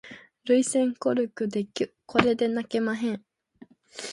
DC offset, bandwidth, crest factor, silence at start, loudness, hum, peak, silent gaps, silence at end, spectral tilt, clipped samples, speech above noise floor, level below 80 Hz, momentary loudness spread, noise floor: under 0.1%; 11.5 kHz; 22 dB; 0.05 s; -26 LUFS; none; -4 dBFS; none; 0 s; -4.5 dB/octave; under 0.1%; 29 dB; -64 dBFS; 16 LU; -54 dBFS